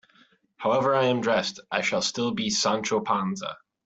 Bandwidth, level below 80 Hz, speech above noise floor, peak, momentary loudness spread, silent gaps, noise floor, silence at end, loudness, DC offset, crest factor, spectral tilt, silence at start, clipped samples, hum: 8.2 kHz; -66 dBFS; 36 dB; -8 dBFS; 8 LU; none; -61 dBFS; 0.3 s; -25 LUFS; under 0.1%; 18 dB; -3.5 dB/octave; 0.6 s; under 0.1%; none